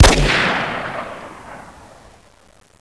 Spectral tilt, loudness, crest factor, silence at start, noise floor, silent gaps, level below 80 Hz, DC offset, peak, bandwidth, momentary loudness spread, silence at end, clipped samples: -3.5 dB/octave; -17 LUFS; 18 dB; 0 s; -49 dBFS; none; -26 dBFS; under 0.1%; 0 dBFS; 11 kHz; 23 LU; 1.1 s; 0.2%